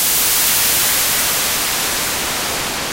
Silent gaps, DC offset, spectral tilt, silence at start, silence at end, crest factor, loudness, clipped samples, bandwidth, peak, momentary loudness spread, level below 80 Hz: none; under 0.1%; 0 dB/octave; 0 s; 0 s; 14 dB; -14 LUFS; under 0.1%; 16.5 kHz; -4 dBFS; 6 LU; -42 dBFS